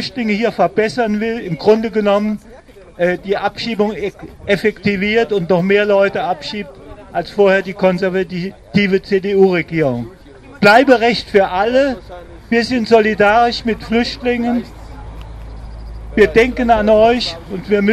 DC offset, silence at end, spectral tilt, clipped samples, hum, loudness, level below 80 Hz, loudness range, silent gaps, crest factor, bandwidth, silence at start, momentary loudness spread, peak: under 0.1%; 0 s; -6 dB/octave; under 0.1%; none; -15 LUFS; -38 dBFS; 4 LU; none; 16 dB; 13.5 kHz; 0 s; 17 LU; 0 dBFS